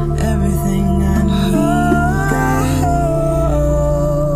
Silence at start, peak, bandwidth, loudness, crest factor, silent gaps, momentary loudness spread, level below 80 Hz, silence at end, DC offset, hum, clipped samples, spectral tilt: 0 s; -2 dBFS; 16 kHz; -15 LUFS; 12 dB; none; 2 LU; -20 dBFS; 0 s; under 0.1%; none; under 0.1%; -7 dB/octave